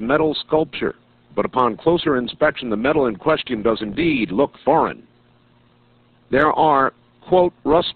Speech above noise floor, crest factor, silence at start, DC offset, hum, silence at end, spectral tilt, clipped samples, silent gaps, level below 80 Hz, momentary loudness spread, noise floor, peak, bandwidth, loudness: 37 dB; 16 dB; 0 s; under 0.1%; none; 0.05 s; -3.5 dB/octave; under 0.1%; none; -48 dBFS; 7 LU; -55 dBFS; -4 dBFS; 4.7 kHz; -19 LUFS